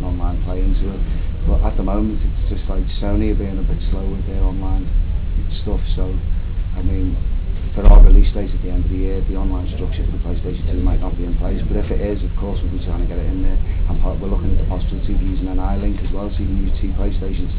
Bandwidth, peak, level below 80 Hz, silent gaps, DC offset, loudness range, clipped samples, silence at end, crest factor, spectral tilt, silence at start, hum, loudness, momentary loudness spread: 4 kHz; 0 dBFS; -16 dBFS; none; 0.5%; 5 LU; 0.2%; 0 s; 16 dB; -11.5 dB/octave; 0 s; none; -21 LUFS; 5 LU